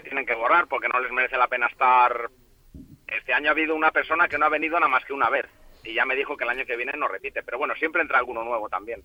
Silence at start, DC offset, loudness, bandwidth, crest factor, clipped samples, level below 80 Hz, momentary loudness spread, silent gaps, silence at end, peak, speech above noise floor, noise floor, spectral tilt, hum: 0.05 s; under 0.1%; -23 LUFS; 16.5 kHz; 18 dB; under 0.1%; -58 dBFS; 10 LU; none; 0.05 s; -8 dBFS; 23 dB; -47 dBFS; -4.5 dB/octave; none